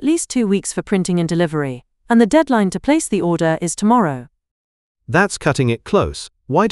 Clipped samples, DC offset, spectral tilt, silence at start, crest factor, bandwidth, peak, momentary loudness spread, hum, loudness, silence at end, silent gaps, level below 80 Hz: under 0.1%; under 0.1%; -5.5 dB/octave; 0 s; 16 dB; 12 kHz; 0 dBFS; 8 LU; none; -17 LUFS; 0 s; 4.51-4.95 s; -44 dBFS